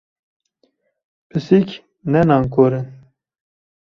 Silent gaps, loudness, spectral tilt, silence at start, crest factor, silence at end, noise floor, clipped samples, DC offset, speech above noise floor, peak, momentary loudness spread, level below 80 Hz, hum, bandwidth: none; -17 LUFS; -9 dB/octave; 1.35 s; 18 dB; 0.95 s; -65 dBFS; under 0.1%; under 0.1%; 49 dB; -2 dBFS; 13 LU; -50 dBFS; none; 6.8 kHz